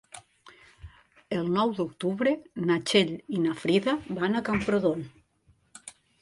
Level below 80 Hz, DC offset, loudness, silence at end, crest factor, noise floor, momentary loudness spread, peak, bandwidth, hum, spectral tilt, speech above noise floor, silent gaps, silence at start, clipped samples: -58 dBFS; under 0.1%; -27 LUFS; 0.3 s; 18 dB; -65 dBFS; 22 LU; -10 dBFS; 11.5 kHz; none; -5.5 dB/octave; 39 dB; none; 0.15 s; under 0.1%